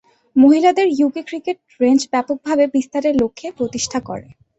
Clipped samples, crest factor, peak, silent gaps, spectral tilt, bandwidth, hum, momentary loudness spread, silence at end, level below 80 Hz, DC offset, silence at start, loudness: under 0.1%; 16 dB; -2 dBFS; none; -4.5 dB/octave; 8.2 kHz; none; 13 LU; 0.4 s; -54 dBFS; under 0.1%; 0.35 s; -17 LUFS